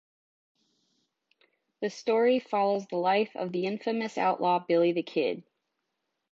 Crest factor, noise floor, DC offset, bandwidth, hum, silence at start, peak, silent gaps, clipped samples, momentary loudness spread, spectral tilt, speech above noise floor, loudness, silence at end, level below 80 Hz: 16 dB; -82 dBFS; under 0.1%; 7.8 kHz; none; 1.8 s; -14 dBFS; none; under 0.1%; 8 LU; -6 dB/octave; 55 dB; -28 LUFS; 0.9 s; -82 dBFS